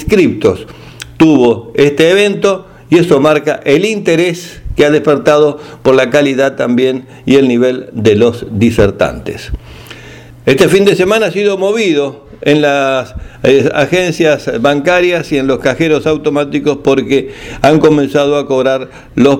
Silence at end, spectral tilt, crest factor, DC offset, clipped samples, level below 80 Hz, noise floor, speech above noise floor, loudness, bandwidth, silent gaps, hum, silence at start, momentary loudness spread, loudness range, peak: 0 s; -5.5 dB/octave; 10 dB; under 0.1%; 0.3%; -36 dBFS; -33 dBFS; 23 dB; -11 LUFS; 16 kHz; none; none; 0 s; 12 LU; 2 LU; 0 dBFS